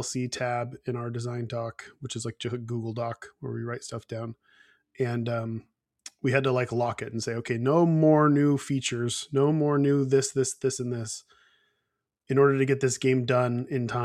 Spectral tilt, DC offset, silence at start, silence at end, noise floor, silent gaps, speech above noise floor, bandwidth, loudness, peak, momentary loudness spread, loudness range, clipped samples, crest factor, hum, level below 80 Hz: -6 dB/octave; under 0.1%; 0 s; 0 s; -82 dBFS; none; 55 dB; 13 kHz; -27 LUFS; -8 dBFS; 15 LU; 10 LU; under 0.1%; 18 dB; none; -68 dBFS